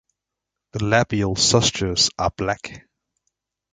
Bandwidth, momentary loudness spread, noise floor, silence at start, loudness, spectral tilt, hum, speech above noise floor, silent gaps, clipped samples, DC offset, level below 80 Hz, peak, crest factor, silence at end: 9.6 kHz; 13 LU; -84 dBFS; 0.75 s; -20 LUFS; -3.5 dB/octave; 50 Hz at -45 dBFS; 64 dB; none; under 0.1%; under 0.1%; -44 dBFS; -2 dBFS; 22 dB; 0.95 s